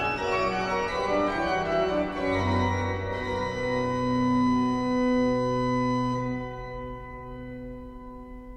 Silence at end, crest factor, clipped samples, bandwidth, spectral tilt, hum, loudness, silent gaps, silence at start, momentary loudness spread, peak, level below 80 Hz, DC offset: 0 s; 12 dB; under 0.1%; 8.6 kHz; -6.5 dB/octave; none; -27 LUFS; none; 0 s; 16 LU; -14 dBFS; -44 dBFS; under 0.1%